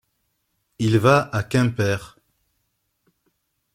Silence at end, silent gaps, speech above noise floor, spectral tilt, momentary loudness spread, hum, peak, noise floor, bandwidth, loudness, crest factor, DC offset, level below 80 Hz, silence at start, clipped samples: 1.65 s; none; 53 dB; -6.5 dB/octave; 9 LU; none; -4 dBFS; -73 dBFS; 16 kHz; -20 LUFS; 20 dB; under 0.1%; -54 dBFS; 0.8 s; under 0.1%